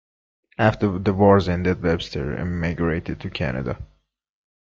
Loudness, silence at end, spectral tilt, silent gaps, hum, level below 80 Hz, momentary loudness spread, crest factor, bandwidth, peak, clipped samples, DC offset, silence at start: -22 LUFS; 0.85 s; -8 dB/octave; none; none; -42 dBFS; 13 LU; 20 dB; 7.4 kHz; -2 dBFS; under 0.1%; under 0.1%; 0.6 s